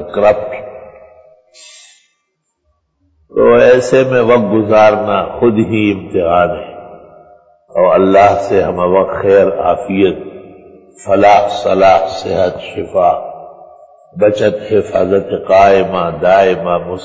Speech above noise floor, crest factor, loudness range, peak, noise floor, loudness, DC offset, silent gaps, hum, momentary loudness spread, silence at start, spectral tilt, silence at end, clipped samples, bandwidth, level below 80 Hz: 56 dB; 12 dB; 4 LU; 0 dBFS; -67 dBFS; -11 LUFS; under 0.1%; none; none; 12 LU; 0 s; -6.5 dB/octave; 0 s; under 0.1%; 8 kHz; -42 dBFS